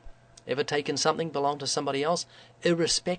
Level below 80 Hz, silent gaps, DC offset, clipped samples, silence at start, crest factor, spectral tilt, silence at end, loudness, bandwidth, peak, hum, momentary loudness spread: -58 dBFS; none; under 0.1%; under 0.1%; 0.05 s; 20 dB; -3.5 dB/octave; 0 s; -28 LUFS; 9.4 kHz; -8 dBFS; none; 7 LU